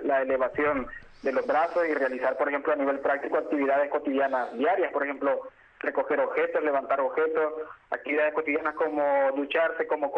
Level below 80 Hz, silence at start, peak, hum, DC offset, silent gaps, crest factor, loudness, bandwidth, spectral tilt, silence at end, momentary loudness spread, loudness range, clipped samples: -62 dBFS; 0 s; -14 dBFS; none; under 0.1%; none; 12 dB; -27 LUFS; 6 kHz; -6 dB/octave; 0 s; 6 LU; 1 LU; under 0.1%